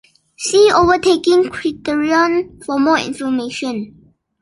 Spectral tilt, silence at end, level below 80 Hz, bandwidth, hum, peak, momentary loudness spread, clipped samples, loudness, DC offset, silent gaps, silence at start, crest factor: -3.5 dB/octave; 0.55 s; -46 dBFS; 11.5 kHz; none; -2 dBFS; 12 LU; under 0.1%; -15 LUFS; under 0.1%; none; 0.4 s; 14 dB